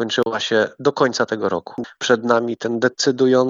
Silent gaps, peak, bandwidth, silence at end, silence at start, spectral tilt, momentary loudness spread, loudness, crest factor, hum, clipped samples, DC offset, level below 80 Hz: none; -2 dBFS; 7.8 kHz; 0 s; 0 s; -4 dB/octave; 7 LU; -19 LUFS; 18 dB; none; under 0.1%; under 0.1%; -68 dBFS